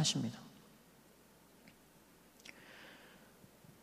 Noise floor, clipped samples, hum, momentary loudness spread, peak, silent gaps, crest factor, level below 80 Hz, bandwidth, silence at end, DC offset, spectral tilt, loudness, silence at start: -64 dBFS; under 0.1%; none; 20 LU; -20 dBFS; none; 26 dB; -76 dBFS; 15.5 kHz; 0.1 s; under 0.1%; -3 dB/octave; -44 LUFS; 0 s